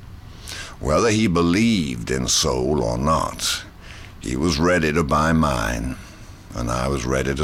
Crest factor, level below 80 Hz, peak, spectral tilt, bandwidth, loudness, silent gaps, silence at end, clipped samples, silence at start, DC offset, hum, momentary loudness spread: 12 dB; -34 dBFS; -8 dBFS; -4.5 dB/octave; 16.5 kHz; -20 LUFS; none; 0 s; under 0.1%; 0 s; under 0.1%; none; 17 LU